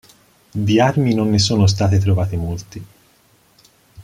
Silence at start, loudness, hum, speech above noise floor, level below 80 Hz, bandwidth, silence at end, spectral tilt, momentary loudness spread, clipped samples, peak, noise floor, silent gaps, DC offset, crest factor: 0.55 s; -17 LUFS; none; 39 dB; -44 dBFS; 11.5 kHz; 0 s; -6 dB/octave; 15 LU; under 0.1%; -2 dBFS; -55 dBFS; none; under 0.1%; 16 dB